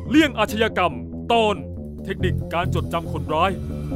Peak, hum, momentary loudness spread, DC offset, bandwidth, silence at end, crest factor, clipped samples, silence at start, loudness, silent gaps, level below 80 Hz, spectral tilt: -4 dBFS; none; 11 LU; under 0.1%; 16 kHz; 0 s; 16 dB; under 0.1%; 0 s; -22 LUFS; none; -38 dBFS; -6 dB/octave